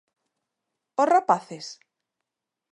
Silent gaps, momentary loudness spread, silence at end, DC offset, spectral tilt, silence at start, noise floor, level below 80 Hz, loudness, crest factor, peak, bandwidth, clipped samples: none; 18 LU; 1 s; under 0.1%; -4.5 dB/octave; 1 s; -87 dBFS; -82 dBFS; -23 LUFS; 22 dB; -6 dBFS; 11 kHz; under 0.1%